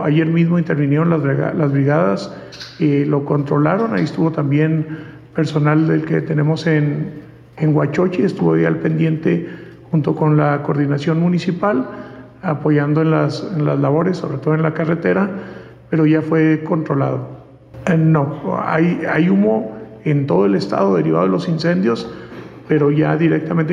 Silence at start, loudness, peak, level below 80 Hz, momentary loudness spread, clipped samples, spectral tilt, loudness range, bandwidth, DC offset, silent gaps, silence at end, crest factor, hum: 0 s; -17 LUFS; -4 dBFS; -54 dBFS; 11 LU; under 0.1%; -8.5 dB/octave; 2 LU; 7.4 kHz; under 0.1%; none; 0 s; 12 dB; none